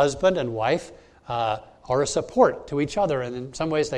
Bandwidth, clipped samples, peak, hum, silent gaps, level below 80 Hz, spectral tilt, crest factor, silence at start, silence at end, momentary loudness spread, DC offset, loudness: 11 kHz; under 0.1%; -4 dBFS; none; none; -50 dBFS; -5 dB/octave; 20 dB; 0 s; 0 s; 10 LU; under 0.1%; -24 LUFS